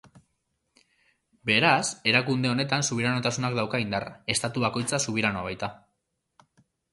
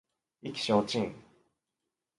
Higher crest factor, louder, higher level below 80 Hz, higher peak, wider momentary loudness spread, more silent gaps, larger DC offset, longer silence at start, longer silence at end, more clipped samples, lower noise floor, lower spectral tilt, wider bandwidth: about the same, 22 dB vs 24 dB; first, -26 LUFS vs -31 LUFS; first, -60 dBFS vs -68 dBFS; first, -6 dBFS vs -12 dBFS; second, 10 LU vs 13 LU; neither; neither; first, 1.45 s vs 0.45 s; first, 1.15 s vs 0.95 s; neither; second, -78 dBFS vs -87 dBFS; second, -3.5 dB/octave vs -5 dB/octave; about the same, 11.5 kHz vs 11.5 kHz